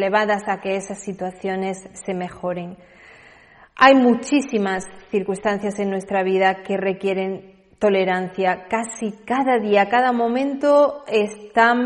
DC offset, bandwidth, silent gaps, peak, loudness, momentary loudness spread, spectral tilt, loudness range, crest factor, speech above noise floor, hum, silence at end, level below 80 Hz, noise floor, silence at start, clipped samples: under 0.1%; 11 kHz; none; 0 dBFS; -20 LUFS; 12 LU; -5 dB/octave; 4 LU; 20 dB; 29 dB; none; 0 s; -60 dBFS; -49 dBFS; 0 s; under 0.1%